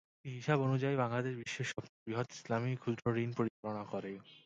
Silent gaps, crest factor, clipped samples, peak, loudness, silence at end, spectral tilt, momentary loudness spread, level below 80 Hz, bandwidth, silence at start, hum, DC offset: 1.89-2.06 s, 3.50-3.63 s; 20 dB; under 0.1%; -16 dBFS; -37 LUFS; 0.05 s; -6.5 dB/octave; 10 LU; -74 dBFS; 8.8 kHz; 0.25 s; none; under 0.1%